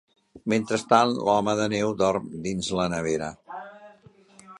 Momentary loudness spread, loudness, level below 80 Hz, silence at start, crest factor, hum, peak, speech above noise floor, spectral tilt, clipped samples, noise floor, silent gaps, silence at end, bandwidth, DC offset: 17 LU; -25 LUFS; -56 dBFS; 0.35 s; 24 dB; none; -2 dBFS; 30 dB; -5 dB/octave; under 0.1%; -54 dBFS; none; 0 s; 11.5 kHz; under 0.1%